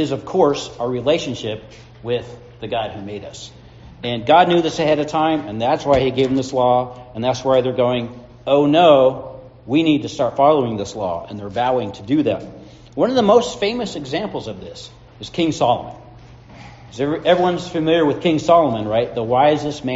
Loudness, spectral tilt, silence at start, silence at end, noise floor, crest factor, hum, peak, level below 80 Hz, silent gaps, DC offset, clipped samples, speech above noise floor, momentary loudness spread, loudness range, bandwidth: -18 LUFS; -4.5 dB/octave; 0 s; 0 s; -41 dBFS; 18 dB; none; 0 dBFS; -48 dBFS; none; under 0.1%; under 0.1%; 24 dB; 18 LU; 7 LU; 8 kHz